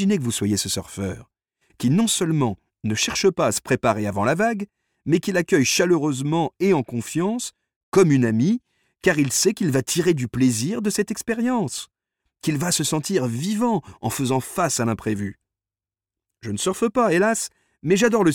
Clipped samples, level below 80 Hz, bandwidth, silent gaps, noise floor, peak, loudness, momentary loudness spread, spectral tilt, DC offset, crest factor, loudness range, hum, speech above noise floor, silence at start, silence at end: under 0.1%; -56 dBFS; 18 kHz; 7.76-7.92 s; under -90 dBFS; -4 dBFS; -22 LUFS; 11 LU; -4.5 dB/octave; under 0.1%; 18 dB; 4 LU; none; over 69 dB; 0 s; 0 s